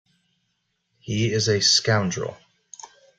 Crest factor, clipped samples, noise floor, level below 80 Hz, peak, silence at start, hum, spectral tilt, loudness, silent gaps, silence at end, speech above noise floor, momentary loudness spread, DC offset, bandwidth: 22 dB; under 0.1%; -74 dBFS; -58 dBFS; -4 dBFS; 1.05 s; none; -3.5 dB/octave; -21 LUFS; none; 0.35 s; 52 dB; 25 LU; under 0.1%; 9.4 kHz